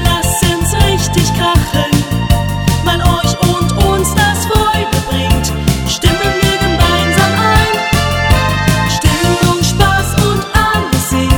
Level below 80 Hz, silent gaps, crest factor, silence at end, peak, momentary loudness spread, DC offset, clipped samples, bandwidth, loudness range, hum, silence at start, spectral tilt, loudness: -20 dBFS; none; 12 dB; 0 s; 0 dBFS; 3 LU; under 0.1%; under 0.1%; over 20 kHz; 1 LU; none; 0 s; -4.5 dB/octave; -12 LUFS